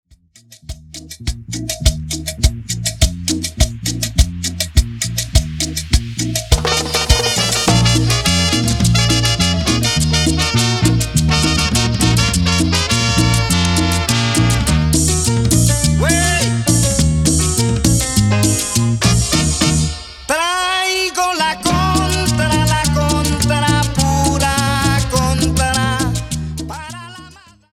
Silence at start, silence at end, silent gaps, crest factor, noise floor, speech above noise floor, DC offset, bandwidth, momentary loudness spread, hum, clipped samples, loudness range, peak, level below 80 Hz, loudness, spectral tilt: 0.5 s; 0.4 s; none; 16 dB; -47 dBFS; 30 dB; under 0.1%; 17 kHz; 7 LU; none; under 0.1%; 4 LU; 0 dBFS; -24 dBFS; -15 LUFS; -4 dB/octave